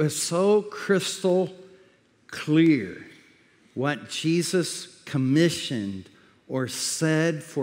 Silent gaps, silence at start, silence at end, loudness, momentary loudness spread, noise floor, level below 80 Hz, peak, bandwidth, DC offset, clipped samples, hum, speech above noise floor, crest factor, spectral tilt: none; 0 s; 0 s; -25 LUFS; 14 LU; -59 dBFS; -74 dBFS; -8 dBFS; 16 kHz; under 0.1%; under 0.1%; none; 35 dB; 18 dB; -5 dB/octave